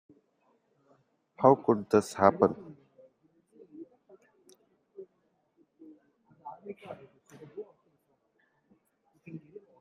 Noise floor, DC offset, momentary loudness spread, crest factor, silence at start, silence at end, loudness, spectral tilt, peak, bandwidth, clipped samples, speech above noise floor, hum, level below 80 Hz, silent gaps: -74 dBFS; under 0.1%; 28 LU; 28 dB; 1.4 s; 0.45 s; -26 LUFS; -7 dB/octave; -6 dBFS; 13.5 kHz; under 0.1%; 49 dB; none; -76 dBFS; none